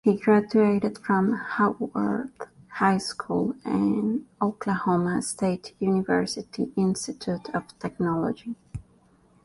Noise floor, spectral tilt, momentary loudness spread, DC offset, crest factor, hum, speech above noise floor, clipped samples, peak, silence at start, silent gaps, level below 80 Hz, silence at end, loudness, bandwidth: -60 dBFS; -6 dB/octave; 12 LU; under 0.1%; 16 dB; none; 35 dB; under 0.1%; -8 dBFS; 0.05 s; none; -58 dBFS; 0.65 s; -26 LUFS; 11.5 kHz